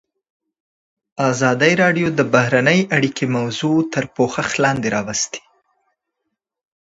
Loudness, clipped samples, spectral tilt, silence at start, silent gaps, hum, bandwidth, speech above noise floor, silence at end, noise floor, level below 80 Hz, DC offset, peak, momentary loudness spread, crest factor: -17 LUFS; under 0.1%; -4.5 dB/octave; 1.15 s; none; none; 8 kHz; 60 dB; 1.45 s; -77 dBFS; -56 dBFS; under 0.1%; 0 dBFS; 8 LU; 18 dB